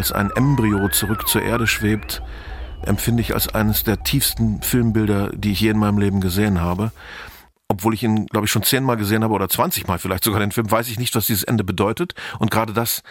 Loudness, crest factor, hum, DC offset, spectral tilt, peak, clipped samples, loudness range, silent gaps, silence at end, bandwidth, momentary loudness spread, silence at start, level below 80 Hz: -19 LUFS; 18 dB; none; under 0.1%; -4.5 dB/octave; -2 dBFS; under 0.1%; 2 LU; none; 0 s; 17 kHz; 8 LU; 0 s; -36 dBFS